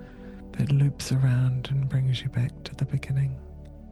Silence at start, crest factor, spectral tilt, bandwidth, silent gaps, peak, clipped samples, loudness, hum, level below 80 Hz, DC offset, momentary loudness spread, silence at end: 0 s; 12 dB; -6.5 dB/octave; 12 kHz; none; -14 dBFS; under 0.1%; -26 LUFS; none; -46 dBFS; under 0.1%; 18 LU; 0 s